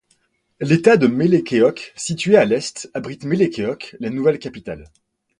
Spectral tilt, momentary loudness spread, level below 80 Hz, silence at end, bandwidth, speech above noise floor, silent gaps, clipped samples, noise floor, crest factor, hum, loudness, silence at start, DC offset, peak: -6 dB/octave; 15 LU; -56 dBFS; 0.55 s; 11 kHz; 46 dB; none; under 0.1%; -64 dBFS; 18 dB; none; -18 LUFS; 0.6 s; under 0.1%; 0 dBFS